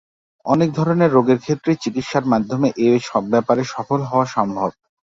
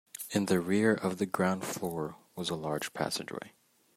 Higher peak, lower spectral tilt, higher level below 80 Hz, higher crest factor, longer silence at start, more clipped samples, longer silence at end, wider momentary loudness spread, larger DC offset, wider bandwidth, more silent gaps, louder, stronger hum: first, -2 dBFS vs -12 dBFS; first, -7 dB/octave vs -5 dB/octave; first, -56 dBFS vs -70 dBFS; about the same, 16 dB vs 20 dB; first, 0.45 s vs 0.15 s; neither; about the same, 0.35 s vs 0.45 s; second, 7 LU vs 12 LU; neither; second, 7.8 kHz vs 16 kHz; neither; first, -18 LUFS vs -32 LUFS; neither